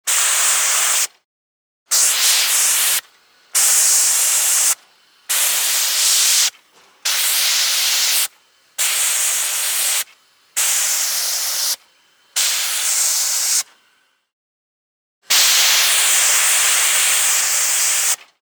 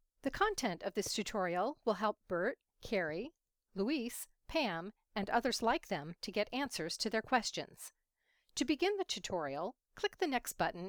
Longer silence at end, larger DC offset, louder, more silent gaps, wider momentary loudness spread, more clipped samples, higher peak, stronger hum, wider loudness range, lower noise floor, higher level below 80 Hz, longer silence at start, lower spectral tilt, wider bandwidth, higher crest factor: first, 0.3 s vs 0 s; neither; first, -14 LUFS vs -37 LUFS; first, 1.25-1.86 s, 14.33-15.22 s vs none; about the same, 8 LU vs 10 LU; neither; first, -4 dBFS vs -18 dBFS; neither; first, 5 LU vs 2 LU; second, -60 dBFS vs -80 dBFS; second, -86 dBFS vs -62 dBFS; second, 0.05 s vs 0.25 s; second, 5.5 dB/octave vs -3.5 dB/octave; about the same, over 20 kHz vs over 20 kHz; second, 14 dB vs 20 dB